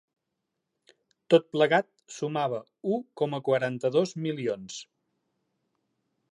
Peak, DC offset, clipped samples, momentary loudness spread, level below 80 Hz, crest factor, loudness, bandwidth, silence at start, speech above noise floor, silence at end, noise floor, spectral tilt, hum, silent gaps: -8 dBFS; under 0.1%; under 0.1%; 12 LU; -80 dBFS; 22 dB; -28 LUFS; 11 kHz; 1.3 s; 56 dB; 1.5 s; -83 dBFS; -5.5 dB/octave; none; none